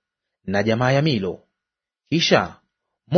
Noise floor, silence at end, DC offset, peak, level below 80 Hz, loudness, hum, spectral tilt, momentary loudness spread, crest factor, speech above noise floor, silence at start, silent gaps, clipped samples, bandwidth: -86 dBFS; 0 s; under 0.1%; -2 dBFS; -56 dBFS; -20 LUFS; none; -5.5 dB/octave; 14 LU; 20 dB; 66 dB; 0.45 s; none; under 0.1%; 6.6 kHz